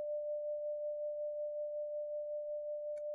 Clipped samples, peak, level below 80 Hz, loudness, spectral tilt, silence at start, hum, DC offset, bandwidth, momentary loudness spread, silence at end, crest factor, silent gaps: under 0.1%; -34 dBFS; -82 dBFS; -41 LUFS; 6 dB/octave; 0 s; none; under 0.1%; 1.5 kHz; 2 LU; 0 s; 6 dB; none